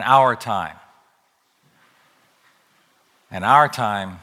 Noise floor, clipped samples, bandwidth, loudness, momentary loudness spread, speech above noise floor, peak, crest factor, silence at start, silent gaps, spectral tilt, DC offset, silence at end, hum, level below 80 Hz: -64 dBFS; under 0.1%; 15.5 kHz; -18 LUFS; 15 LU; 46 dB; 0 dBFS; 22 dB; 0 s; none; -5 dB/octave; under 0.1%; 0.05 s; none; -64 dBFS